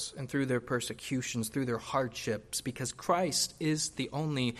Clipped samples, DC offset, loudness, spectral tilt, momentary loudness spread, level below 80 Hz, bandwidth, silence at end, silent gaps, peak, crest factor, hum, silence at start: under 0.1%; under 0.1%; -33 LUFS; -4 dB/octave; 5 LU; -62 dBFS; 14.5 kHz; 0 s; none; -14 dBFS; 18 dB; none; 0 s